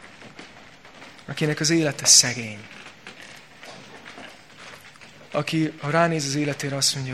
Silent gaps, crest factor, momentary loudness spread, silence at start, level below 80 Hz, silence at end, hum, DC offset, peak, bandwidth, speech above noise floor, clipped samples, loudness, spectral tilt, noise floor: none; 24 dB; 28 LU; 0.05 s; -64 dBFS; 0 s; none; 0.2%; -2 dBFS; 15.5 kHz; 25 dB; under 0.1%; -20 LUFS; -2.5 dB/octave; -47 dBFS